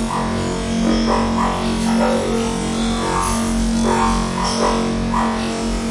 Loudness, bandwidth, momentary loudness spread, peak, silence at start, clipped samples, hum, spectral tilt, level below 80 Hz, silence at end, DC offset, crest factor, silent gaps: -19 LUFS; 11.5 kHz; 4 LU; -4 dBFS; 0 s; under 0.1%; none; -5 dB/octave; -28 dBFS; 0 s; under 0.1%; 14 dB; none